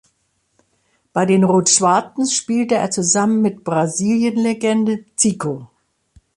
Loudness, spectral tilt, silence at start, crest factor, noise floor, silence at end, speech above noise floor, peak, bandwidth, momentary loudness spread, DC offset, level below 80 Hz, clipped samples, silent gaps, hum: -17 LUFS; -4 dB/octave; 1.15 s; 18 dB; -66 dBFS; 0.7 s; 50 dB; 0 dBFS; 11.5 kHz; 8 LU; under 0.1%; -60 dBFS; under 0.1%; none; none